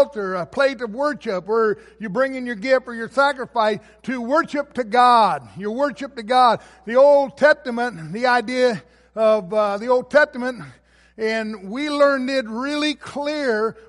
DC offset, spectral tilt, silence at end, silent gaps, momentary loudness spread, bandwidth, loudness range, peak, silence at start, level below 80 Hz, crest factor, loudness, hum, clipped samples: under 0.1%; -5 dB/octave; 0.1 s; none; 11 LU; 11.5 kHz; 4 LU; -4 dBFS; 0 s; -60 dBFS; 16 dB; -20 LUFS; none; under 0.1%